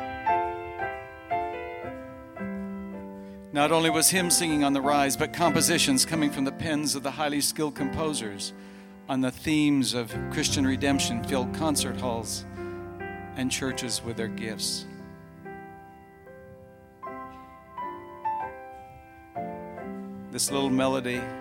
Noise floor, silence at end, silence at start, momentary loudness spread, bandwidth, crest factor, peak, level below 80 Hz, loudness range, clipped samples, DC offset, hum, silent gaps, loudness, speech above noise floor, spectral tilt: -50 dBFS; 0 s; 0 s; 21 LU; 17 kHz; 24 dB; -6 dBFS; -52 dBFS; 15 LU; under 0.1%; under 0.1%; none; none; -27 LUFS; 24 dB; -3.5 dB/octave